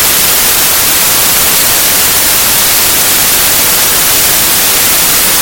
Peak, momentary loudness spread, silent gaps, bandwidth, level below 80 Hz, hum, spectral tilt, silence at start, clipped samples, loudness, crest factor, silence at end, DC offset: 0 dBFS; 0 LU; none; over 20 kHz; -32 dBFS; none; 0 dB/octave; 0 s; 0.8%; -5 LUFS; 8 dB; 0 s; under 0.1%